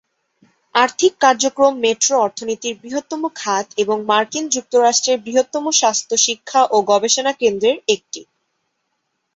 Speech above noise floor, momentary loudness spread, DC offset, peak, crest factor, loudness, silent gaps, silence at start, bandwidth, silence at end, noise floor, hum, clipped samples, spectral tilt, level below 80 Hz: 55 dB; 9 LU; under 0.1%; 0 dBFS; 18 dB; -17 LUFS; none; 0.75 s; 8.2 kHz; 1.15 s; -72 dBFS; none; under 0.1%; -1 dB/octave; -66 dBFS